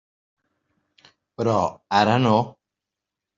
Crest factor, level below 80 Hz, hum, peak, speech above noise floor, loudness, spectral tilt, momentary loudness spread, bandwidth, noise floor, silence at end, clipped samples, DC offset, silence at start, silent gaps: 20 dB; -62 dBFS; none; -4 dBFS; 66 dB; -21 LUFS; -6.5 dB/octave; 8 LU; 7.6 kHz; -86 dBFS; 0.85 s; under 0.1%; under 0.1%; 1.4 s; none